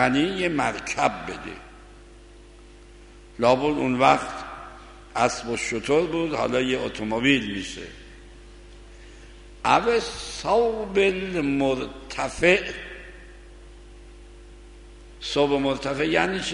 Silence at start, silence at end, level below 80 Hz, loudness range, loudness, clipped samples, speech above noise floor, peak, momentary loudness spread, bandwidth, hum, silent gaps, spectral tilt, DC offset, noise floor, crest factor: 0 s; 0 s; -46 dBFS; 4 LU; -23 LUFS; under 0.1%; 24 dB; -4 dBFS; 18 LU; 11 kHz; none; none; -4.5 dB/octave; under 0.1%; -47 dBFS; 22 dB